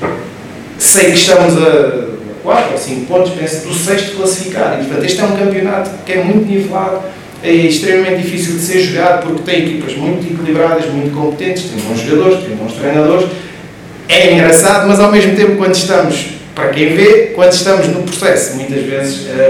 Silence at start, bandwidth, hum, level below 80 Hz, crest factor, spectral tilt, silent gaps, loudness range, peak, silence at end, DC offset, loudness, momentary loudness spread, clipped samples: 0 s; over 20 kHz; none; -48 dBFS; 10 dB; -4 dB/octave; none; 5 LU; 0 dBFS; 0 s; under 0.1%; -11 LUFS; 12 LU; 1%